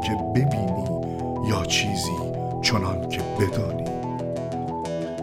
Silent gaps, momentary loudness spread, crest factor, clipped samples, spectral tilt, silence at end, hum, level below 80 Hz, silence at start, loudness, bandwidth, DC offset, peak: none; 7 LU; 18 dB; under 0.1%; -5 dB/octave; 0 s; none; -44 dBFS; 0 s; -25 LUFS; 16.5 kHz; under 0.1%; -8 dBFS